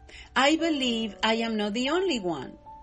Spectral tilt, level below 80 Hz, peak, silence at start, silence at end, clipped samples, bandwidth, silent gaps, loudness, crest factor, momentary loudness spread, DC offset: -3.5 dB/octave; -56 dBFS; -8 dBFS; 0 s; 0 s; under 0.1%; 10 kHz; none; -26 LUFS; 18 dB; 9 LU; under 0.1%